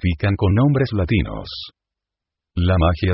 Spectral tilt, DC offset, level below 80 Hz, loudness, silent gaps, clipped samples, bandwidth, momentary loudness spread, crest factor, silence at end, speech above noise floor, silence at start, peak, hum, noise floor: -12 dB/octave; under 0.1%; -28 dBFS; -19 LUFS; none; under 0.1%; 5.8 kHz; 15 LU; 14 dB; 0 s; 67 dB; 0.05 s; -4 dBFS; none; -85 dBFS